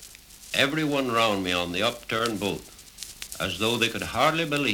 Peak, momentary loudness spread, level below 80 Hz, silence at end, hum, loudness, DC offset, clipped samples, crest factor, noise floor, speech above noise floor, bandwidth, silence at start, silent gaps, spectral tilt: -6 dBFS; 16 LU; -54 dBFS; 0 s; none; -25 LUFS; under 0.1%; under 0.1%; 20 dB; -47 dBFS; 21 dB; 19.5 kHz; 0 s; none; -3.5 dB/octave